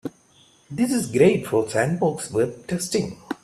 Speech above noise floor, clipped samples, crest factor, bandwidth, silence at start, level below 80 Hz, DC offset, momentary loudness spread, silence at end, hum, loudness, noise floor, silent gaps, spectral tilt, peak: 34 dB; under 0.1%; 18 dB; 14 kHz; 0.05 s; -58 dBFS; under 0.1%; 11 LU; 0.1 s; none; -22 LUFS; -56 dBFS; none; -5.5 dB/octave; -4 dBFS